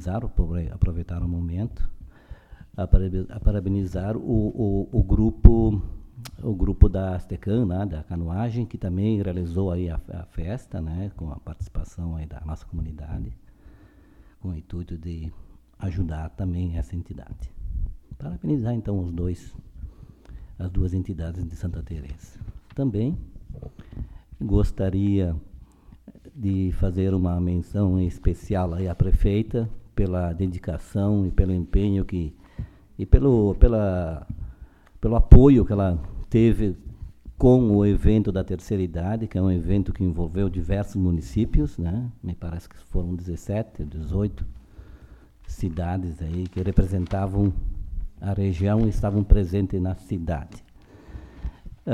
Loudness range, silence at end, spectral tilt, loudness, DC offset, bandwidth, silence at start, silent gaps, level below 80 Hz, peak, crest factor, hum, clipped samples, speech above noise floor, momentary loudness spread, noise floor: 12 LU; 0 s; -9.5 dB/octave; -25 LUFS; under 0.1%; 9.4 kHz; 0 s; none; -28 dBFS; 0 dBFS; 24 dB; none; under 0.1%; 29 dB; 18 LU; -51 dBFS